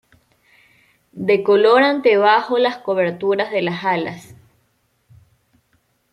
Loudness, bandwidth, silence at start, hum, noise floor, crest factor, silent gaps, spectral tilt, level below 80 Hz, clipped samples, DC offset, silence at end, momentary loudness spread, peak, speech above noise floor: -17 LUFS; 11 kHz; 1.15 s; none; -65 dBFS; 18 dB; none; -6 dB/octave; -66 dBFS; under 0.1%; under 0.1%; 1.95 s; 10 LU; -2 dBFS; 48 dB